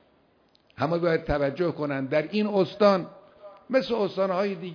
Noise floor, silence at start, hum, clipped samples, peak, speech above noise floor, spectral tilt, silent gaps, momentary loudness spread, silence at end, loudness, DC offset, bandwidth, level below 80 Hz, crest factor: -63 dBFS; 0.8 s; none; under 0.1%; -8 dBFS; 38 dB; -7.5 dB/octave; none; 6 LU; 0 s; -26 LUFS; under 0.1%; 5.4 kHz; -50 dBFS; 18 dB